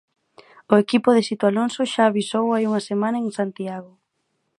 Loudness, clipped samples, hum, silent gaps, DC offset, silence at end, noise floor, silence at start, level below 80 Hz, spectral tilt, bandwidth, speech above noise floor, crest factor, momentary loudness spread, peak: -21 LUFS; under 0.1%; none; none; under 0.1%; 0.75 s; -73 dBFS; 0.7 s; -70 dBFS; -5.5 dB/octave; 11.5 kHz; 53 dB; 20 dB; 9 LU; 0 dBFS